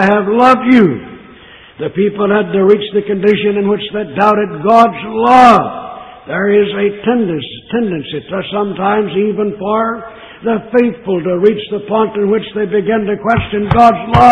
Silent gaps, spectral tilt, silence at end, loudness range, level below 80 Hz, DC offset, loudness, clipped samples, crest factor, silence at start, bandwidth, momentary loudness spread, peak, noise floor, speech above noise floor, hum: none; -7.5 dB/octave; 0 s; 5 LU; -40 dBFS; 0.1%; -12 LUFS; 0.3%; 12 dB; 0 s; 9.8 kHz; 12 LU; 0 dBFS; -38 dBFS; 26 dB; none